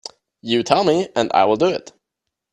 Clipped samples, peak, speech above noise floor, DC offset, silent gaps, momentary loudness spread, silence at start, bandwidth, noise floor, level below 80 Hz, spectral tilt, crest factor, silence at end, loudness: under 0.1%; 0 dBFS; 64 dB; under 0.1%; none; 15 LU; 0.45 s; 11 kHz; -81 dBFS; -60 dBFS; -5 dB/octave; 20 dB; 0.7 s; -18 LUFS